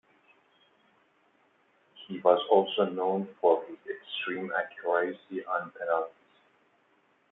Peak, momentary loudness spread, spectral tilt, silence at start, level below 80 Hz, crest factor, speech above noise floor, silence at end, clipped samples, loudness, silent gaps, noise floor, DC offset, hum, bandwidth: -8 dBFS; 15 LU; -8 dB/octave; 1.95 s; -86 dBFS; 22 dB; 40 dB; 1.2 s; under 0.1%; -29 LUFS; none; -68 dBFS; under 0.1%; none; 4 kHz